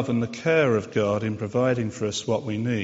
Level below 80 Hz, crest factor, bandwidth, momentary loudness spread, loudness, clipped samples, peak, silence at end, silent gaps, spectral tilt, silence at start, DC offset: -58 dBFS; 16 dB; 8 kHz; 6 LU; -24 LUFS; under 0.1%; -8 dBFS; 0 s; none; -5.5 dB/octave; 0 s; under 0.1%